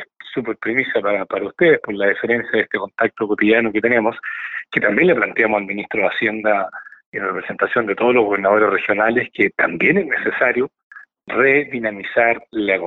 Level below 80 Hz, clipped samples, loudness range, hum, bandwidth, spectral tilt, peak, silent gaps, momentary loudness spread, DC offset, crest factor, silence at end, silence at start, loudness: -58 dBFS; under 0.1%; 2 LU; none; 4.3 kHz; -3.5 dB/octave; -2 dBFS; 7.06-7.12 s, 10.83-10.90 s; 9 LU; under 0.1%; 16 dB; 0 s; 0 s; -18 LUFS